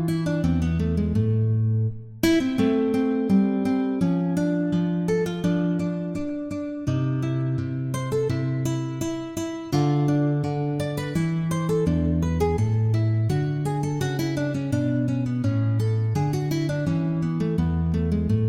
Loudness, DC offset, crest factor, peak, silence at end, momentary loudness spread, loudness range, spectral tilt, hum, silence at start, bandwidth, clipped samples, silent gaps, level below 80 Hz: -24 LUFS; under 0.1%; 16 dB; -8 dBFS; 0 s; 6 LU; 4 LU; -7.5 dB/octave; none; 0 s; 16 kHz; under 0.1%; none; -44 dBFS